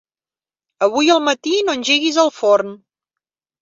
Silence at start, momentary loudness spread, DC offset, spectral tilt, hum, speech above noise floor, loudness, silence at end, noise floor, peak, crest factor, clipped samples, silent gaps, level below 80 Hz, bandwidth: 0.8 s; 5 LU; under 0.1%; -2 dB/octave; none; over 74 dB; -16 LUFS; 0.85 s; under -90 dBFS; -2 dBFS; 16 dB; under 0.1%; none; -66 dBFS; 7.8 kHz